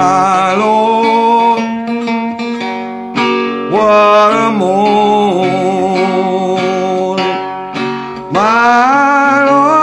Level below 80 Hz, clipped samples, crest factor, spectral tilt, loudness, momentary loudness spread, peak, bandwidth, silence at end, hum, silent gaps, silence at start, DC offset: -54 dBFS; under 0.1%; 10 dB; -5.5 dB/octave; -11 LUFS; 10 LU; 0 dBFS; 11.5 kHz; 0 s; none; none; 0 s; under 0.1%